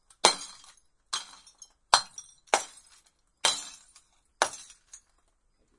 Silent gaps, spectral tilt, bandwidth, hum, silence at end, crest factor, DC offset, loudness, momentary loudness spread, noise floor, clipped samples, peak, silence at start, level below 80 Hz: none; 1 dB/octave; 11.5 kHz; none; 1.15 s; 32 dB; under 0.1%; -28 LUFS; 23 LU; -70 dBFS; under 0.1%; 0 dBFS; 0.25 s; -66 dBFS